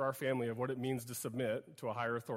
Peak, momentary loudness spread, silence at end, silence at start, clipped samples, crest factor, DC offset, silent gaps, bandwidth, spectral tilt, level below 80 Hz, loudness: -22 dBFS; 5 LU; 0 s; 0 s; under 0.1%; 16 dB; under 0.1%; none; 16 kHz; -5.5 dB/octave; -76 dBFS; -39 LUFS